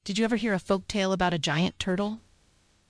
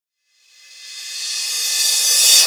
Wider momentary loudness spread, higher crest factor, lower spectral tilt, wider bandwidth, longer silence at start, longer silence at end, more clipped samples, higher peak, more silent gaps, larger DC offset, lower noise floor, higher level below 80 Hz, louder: second, 5 LU vs 19 LU; about the same, 16 dB vs 18 dB; first, -5 dB/octave vs 7.5 dB/octave; second, 11 kHz vs over 20 kHz; second, 0.05 s vs 0.75 s; first, 0.7 s vs 0 s; neither; second, -12 dBFS vs 0 dBFS; neither; neither; first, -64 dBFS vs -60 dBFS; first, -52 dBFS vs -88 dBFS; second, -27 LUFS vs -14 LUFS